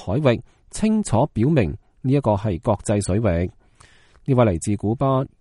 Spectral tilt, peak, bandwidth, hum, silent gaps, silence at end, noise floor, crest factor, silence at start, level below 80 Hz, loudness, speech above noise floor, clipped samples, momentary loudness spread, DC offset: -7 dB/octave; -2 dBFS; 11.5 kHz; none; none; 0.15 s; -52 dBFS; 18 dB; 0 s; -40 dBFS; -21 LUFS; 32 dB; under 0.1%; 8 LU; under 0.1%